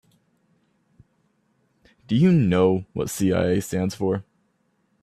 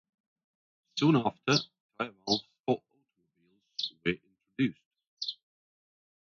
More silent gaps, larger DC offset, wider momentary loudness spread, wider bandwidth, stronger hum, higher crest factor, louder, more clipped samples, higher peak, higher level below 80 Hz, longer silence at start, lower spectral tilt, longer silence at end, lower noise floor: second, none vs 1.80-1.89 s, 2.60-2.64 s, 4.86-4.91 s, 5.07-5.17 s; neither; second, 9 LU vs 15 LU; first, 14 kHz vs 7.4 kHz; neither; about the same, 18 dB vs 22 dB; first, -22 LUFS vs -32 LUFS; neither; first, -6 dBFS vs -12 dBFS; first, -56 dBFS vs -68 dBFS; first, 2.1 s vs 0.95 s; first, -7 dB/octave vs -5 dB/octave; second, 0.8 s vs 0.95 s; second, -68 dBFS vs -75 dBFS